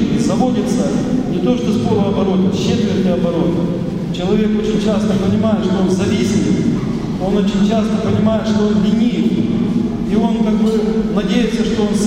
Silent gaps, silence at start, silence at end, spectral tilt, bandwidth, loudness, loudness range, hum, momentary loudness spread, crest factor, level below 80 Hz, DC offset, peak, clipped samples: none; 0 s; 0 s; -7 dB/octave; 11 kHz; -16 LUFS; 1 LU; none; 3 LU; 14 dB; -36 dBFS; under 0.1%; -2 dBFS; under 0.1%